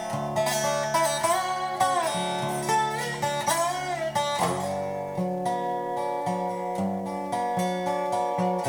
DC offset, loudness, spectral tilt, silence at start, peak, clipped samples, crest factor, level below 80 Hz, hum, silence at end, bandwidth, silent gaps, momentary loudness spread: under 0.1%; -27 LUFS; -4 dB/octave; 0 s; -10 dBFS; under 0.1%; 16 dB; -62 dBFS; none; 0 s; over 20 kHz; none; 5 LU